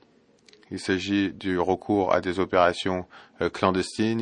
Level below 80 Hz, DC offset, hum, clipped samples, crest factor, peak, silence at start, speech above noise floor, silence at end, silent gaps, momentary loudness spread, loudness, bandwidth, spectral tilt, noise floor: -60 dBFS; under 0.1%; none; under 0.1%; 20 dB; -6 dBFS; 0.7 s; 34 dB; 0 s; none; 10 LU; -25 LUFS; 10.5 kHz; -5.5 dB/octave; -59 dBFS